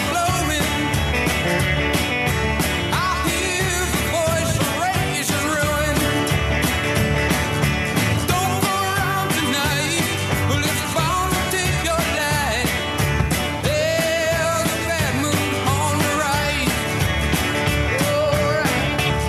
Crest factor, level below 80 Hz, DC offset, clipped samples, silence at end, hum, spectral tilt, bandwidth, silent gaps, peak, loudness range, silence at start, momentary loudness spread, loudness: 16 dB; -34 dBFS; under 0.1%; under 0.1%; 0 s; none; -4 dB/octave; 14 kHz; none; -4 dBFS; 1 LU; 0 s; 2 LU; -19 LUFS